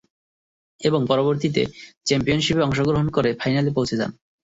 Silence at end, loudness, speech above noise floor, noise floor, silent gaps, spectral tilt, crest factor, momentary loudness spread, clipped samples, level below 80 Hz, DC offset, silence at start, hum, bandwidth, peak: 0.45 s; -22 LUFS; over 69 dB; under -90 dBFS; 1.97-2.01 s; -5.5 dB/octave; 18 dB; 7 LU; under 0.1%; -48 dBFS; under 0.1%; 0.8 s; none; 8 kHz; -4 dBFS